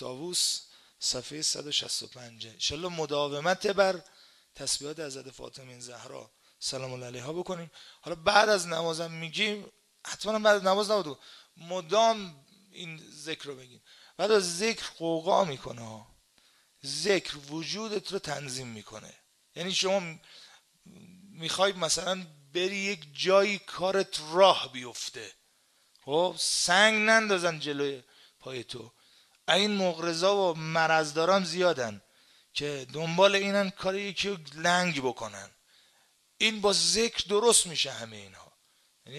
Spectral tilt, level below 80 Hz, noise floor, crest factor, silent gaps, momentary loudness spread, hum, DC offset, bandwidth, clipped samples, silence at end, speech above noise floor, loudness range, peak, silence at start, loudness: -2.5 dB/octave; -66 dBFS; -67 dBFS; 26 dB; none; 20 LU; none; under 0.1%; 13.5 kHz; under 0.1%; 0 s; 38 dB; 7 LU; -4 dBFS; 0 s; -28 LUFS